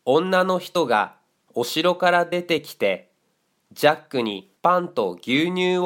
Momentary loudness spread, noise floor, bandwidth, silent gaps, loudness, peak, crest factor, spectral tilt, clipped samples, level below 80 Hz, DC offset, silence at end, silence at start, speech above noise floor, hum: 7 LU; -69 dBFS; 17 kHz; none; -22 LUFS; -2 dBFS; 20 dB; -5 dB/octave; under 0.1%; -70 dBFS; under 0.1%; 0 s; 0.05 s; 48 dB; none